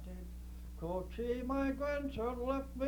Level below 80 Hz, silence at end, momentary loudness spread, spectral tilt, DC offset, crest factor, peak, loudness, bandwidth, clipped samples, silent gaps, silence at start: -48 dBFS; 0 s; 14 LU; -7.5 dB/octave; under 0.1%; 16 dB; -22 dBFS; -39 LUFS; over 20 kHz; under 0.1%; none; 0 s